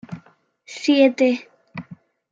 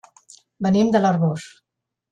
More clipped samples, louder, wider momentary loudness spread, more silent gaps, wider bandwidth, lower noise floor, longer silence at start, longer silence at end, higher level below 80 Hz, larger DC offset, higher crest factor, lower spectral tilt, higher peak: neither; about the same, -18 LUFS vs -19 LUFS; first, 22 LU vs 9 LU; neither; second, 7.6 kHz vs 9.8 kHz; about the same, -54 dBFS vs -51 dBFS; second, 0.1 s vs 0.6 s; second, 0.35 s vs 0.65 s; second, -70 dBFS vs -60 dBFS; neither; about the same, 18 dB vs 16 dB; second, -5 dB/octave vs -7 dB/octave; about the same, -4 dBFS vs -4 dBFS